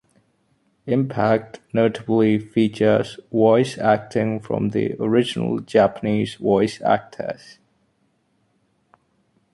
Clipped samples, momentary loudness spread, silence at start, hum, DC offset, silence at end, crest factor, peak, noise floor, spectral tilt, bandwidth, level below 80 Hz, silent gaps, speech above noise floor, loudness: under 0.1%; 7 LU; 0.85 s; none; under 0.1%; 2.2 s; 18 dB; -4 dBFS; -66 dBFS; -7 dB/octave; 11.5 kHz; -58 dBFS; none; 46 dB; -20 LUFS